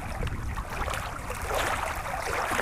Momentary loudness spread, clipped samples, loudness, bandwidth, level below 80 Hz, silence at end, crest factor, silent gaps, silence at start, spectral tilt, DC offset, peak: 7 LU; under 0.1%; -31 LUFS; 16 kHz; -38 dBFS; 0 s; 20 dB; none; 0 s; -3.5 dB/octave; under 0.1%; -10 dBFS